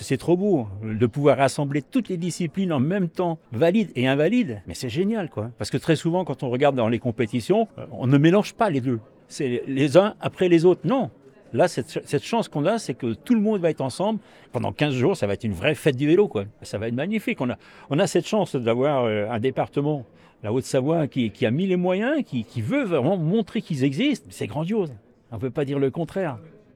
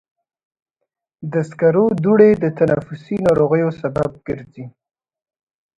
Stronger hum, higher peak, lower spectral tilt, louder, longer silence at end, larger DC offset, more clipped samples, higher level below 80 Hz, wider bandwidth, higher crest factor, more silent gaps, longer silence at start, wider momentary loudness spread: neither; second, -4 dBFS vs 0 dBFS; second, -6.5 dB/octave vs -9 dB/octave; second, -23 LUFS vs -17 LUFS; second, 0.3 s vs 1.1 s; neither; neither; second, -62 dBFS vs -50 dBFS; first, 15.5 kHz vs 9.2 kHz; about the same, 20 dB vs 18 dB; neither; second, 0 s vs 1.2 s; second, 10 LU vs 16 LU